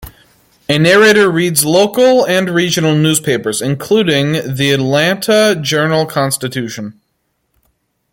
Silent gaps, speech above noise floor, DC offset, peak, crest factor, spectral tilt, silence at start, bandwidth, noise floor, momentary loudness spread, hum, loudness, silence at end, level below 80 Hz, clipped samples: none; 54 dB; under 0.1%; 0 dBFS; 12 dB; -4 dB/octave; 0 s; 17 kHz; -66 dBFS; 9 LU; none; -12 LUFS; 1.2 s; -50 dBFS; under 0.1%